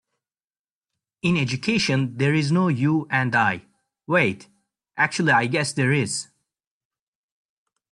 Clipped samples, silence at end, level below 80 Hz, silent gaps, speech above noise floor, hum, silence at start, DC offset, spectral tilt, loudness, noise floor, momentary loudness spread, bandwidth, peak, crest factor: under 0.1%; 1.7 s; -60 dBFS; none; over 69 dB; none; 1.25 s; under 0.1%; -5 dB/octave; -22 LUFS; under -90 dBFS; 8 LU; 11.5 kHz; -6 dBFS; 18 dB